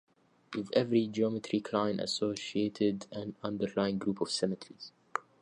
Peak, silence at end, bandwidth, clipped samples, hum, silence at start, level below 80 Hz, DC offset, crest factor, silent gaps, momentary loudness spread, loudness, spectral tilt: -12 dBFS; 0.2 s; 11 kHz; under 0.1%; none; 0.5 s; -70 dBFS; under 0.1%; 20 dB; none; 11 LU; -33 LUFS; -5.5 dB/octave